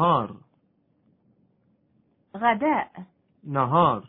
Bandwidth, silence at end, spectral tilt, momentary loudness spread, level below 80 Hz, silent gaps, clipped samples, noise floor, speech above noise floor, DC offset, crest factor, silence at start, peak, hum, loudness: 4.1 kHz; 0.05 s; -10.5 dB/octave; 25 LU; -62 dBFS; none; under 0.1%; -67 dBFS; 44 dB; under 0.1%; 20 dB; 0 s; -6 dBFS; none; -24 LUFS